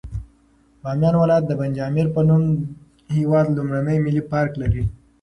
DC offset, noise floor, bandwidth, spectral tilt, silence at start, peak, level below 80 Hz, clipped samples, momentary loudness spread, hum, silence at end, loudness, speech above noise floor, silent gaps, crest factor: under 0.1%; -56 dBFS; 6.2 kHz; -9.5 dB/octave; 0.05 s; -6 dBFS; -38 dBFS; under 0.1%; 11 LU; none; 0.3 s; -20 LUFS; 37 dB; none; 14 dB